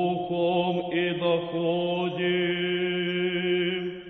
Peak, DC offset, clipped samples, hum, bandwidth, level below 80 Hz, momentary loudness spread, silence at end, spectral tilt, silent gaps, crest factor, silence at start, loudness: -14 dBFS; under 0.1%; under 0.1%; none; 4.1 kHz; -64 dBFS; 2 LU; 0 s; -8.5 dB/octave; none; 12 dB; 0 s; -26 LUFS